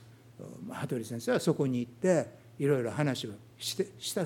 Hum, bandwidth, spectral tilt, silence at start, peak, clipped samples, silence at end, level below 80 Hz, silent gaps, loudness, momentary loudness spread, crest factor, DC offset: none; 18 kHz; -5.5 dB/octave; 0 s; -12 dBFS; under 0.1%; 0 s; -74 dBFS; none; -32 LUFS; 14 LU; 20 dB; under 0.1%